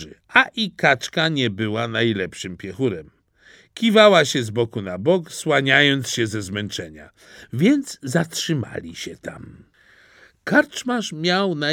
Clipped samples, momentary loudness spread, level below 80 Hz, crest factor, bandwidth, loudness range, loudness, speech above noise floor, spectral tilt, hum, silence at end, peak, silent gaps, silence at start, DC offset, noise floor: under 0.1%; 17 LU; -60 dBFS; 20 dB; 17 kHz; 7 LU; -19 LUFS; 33 dB; -4.5 dB/octave; none; 0 s; 0 dBFS; none; 0 s; under 0.1%; -53 dBFS